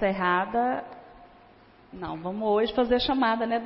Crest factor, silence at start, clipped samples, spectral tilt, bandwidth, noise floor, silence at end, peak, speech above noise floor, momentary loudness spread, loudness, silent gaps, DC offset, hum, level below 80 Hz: 16 dB; 0 s; under 0.1%; -9.5 dB/octave; 5.8 kHz; -54 dBFS; 0 s; -10 dBFS; 29 dB; 12 LU; -26 LUFS; none; under 0.1%; none; -52 dBFS